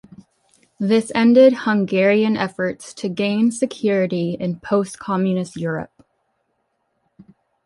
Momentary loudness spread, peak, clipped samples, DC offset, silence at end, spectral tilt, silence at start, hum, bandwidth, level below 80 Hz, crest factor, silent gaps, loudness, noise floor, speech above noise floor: 12 LU; -2 dBFS; under 0.1%; under 0.1%; 1.8 s; -6 dB/octave; 0.8 s; none; 11.5 kHz; -62 dBFS; 18 dB; none; -19 LUFS; -70 dBFS; 52 dB